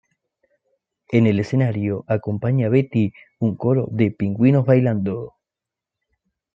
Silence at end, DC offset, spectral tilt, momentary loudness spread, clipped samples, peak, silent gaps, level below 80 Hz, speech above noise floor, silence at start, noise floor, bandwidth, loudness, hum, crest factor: 1.25 s; under 0.1%; -10 dB/octave; 8 LU; under 0.1%; -2 dBFS; none; -60 dBFS; 68 dB; 1.1 s; -87 dBFS; 7.2 kHz; -20 LUFS; none; 18 dB